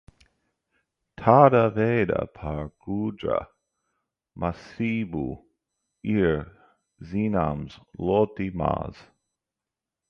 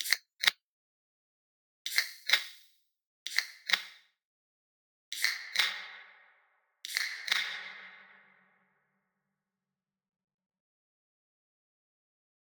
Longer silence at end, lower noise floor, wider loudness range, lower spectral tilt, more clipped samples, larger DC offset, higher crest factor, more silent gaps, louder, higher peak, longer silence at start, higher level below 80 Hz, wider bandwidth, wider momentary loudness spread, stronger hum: second, 1.15 s vs 4.45 s; about the same, -88 dBFS vs under -90 dBFS; first, 8 LU vs 4 LU; first, -9.5 dB/octave vs 3.5 dB/octave; neither; neither; second, 24 dB vs 36 dB; second, none vs 0.63-1.85 s, 3.06-3.26 s, 4.25-5.11 s; first, -25 LUFS vs -31 LUFS; about the same, -2 dBFS vs -4 dBFS; first, 1.2 s vs 0 s; first, -48 dBFS vs under -90 dBFS; second, 6.6 kHz vs 19.5 kHz; about the same, 16 LU vs 18 LU; neither